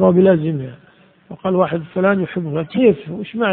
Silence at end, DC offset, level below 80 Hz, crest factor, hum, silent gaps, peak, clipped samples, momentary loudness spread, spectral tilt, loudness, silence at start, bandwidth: 0 s; under 0.1%; -54 dBFS; 16 dB; none; none; 0 dBFS; under 0.1%; 13 LU; -7 dB/octave; -18 LUFS; 0 s; 4.2 kHz